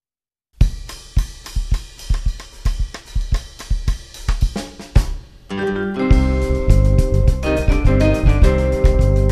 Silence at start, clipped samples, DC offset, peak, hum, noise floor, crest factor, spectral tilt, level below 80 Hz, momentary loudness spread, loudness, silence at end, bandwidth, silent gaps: 0.6 s; under 0.1%; 0.2%; 0 dBFS; none; under -90 dBFS; 16 dB; -7 dB/octave; -18 dBFS; 12 LU; -19 LUFS; 0 s; 12.5 kHz; none